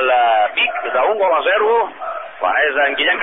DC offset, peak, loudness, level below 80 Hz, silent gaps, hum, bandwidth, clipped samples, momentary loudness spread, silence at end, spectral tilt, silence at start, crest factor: 0.5%; -4 dBFS; -16 LUFS; -58 dBFS; none; none; 3.9 kHz; under 0.1%; 8 LU; 0 s; 7.5 dB/octave; 0 s; 12 dB